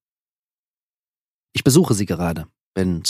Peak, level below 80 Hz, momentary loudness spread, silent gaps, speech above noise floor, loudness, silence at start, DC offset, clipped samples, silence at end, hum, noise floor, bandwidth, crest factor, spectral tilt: -2 dBFS; -46 dBFS; 14 LU; 2.61-2.72 s; over 72 dB; -19 LUFS; 1.55 s; under 0.1%; under 0.1%; 0 s; none; under -90 dBFS; 15.5 kHz; 20 dB; -5 dB/octave